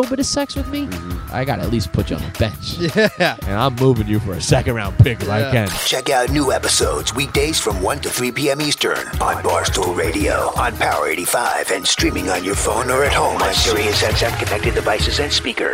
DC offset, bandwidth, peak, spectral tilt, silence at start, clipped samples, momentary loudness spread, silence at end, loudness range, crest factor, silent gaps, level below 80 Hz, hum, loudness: under 0.1%; 16.5 kHz; 0 dBFS; -4 dB/octave; 0 s; under 0.1%; 6 LU; 0 s; 2 LU; 18 dB; none; -30 dBFS; none; -17 LUFS